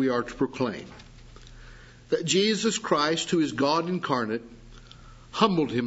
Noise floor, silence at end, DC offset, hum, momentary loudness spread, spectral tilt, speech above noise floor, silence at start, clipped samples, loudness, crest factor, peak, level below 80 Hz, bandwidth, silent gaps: -48 dBFS; 0 s; under 0.1%; 60 Hz at -55 dBFS; 9 LU; -4 dB/octave; 23 dB; 0 s; under 0.1%; -26 LUFS; 22 dB; -4 dBFS; -54 dBFS; 8 kHz; none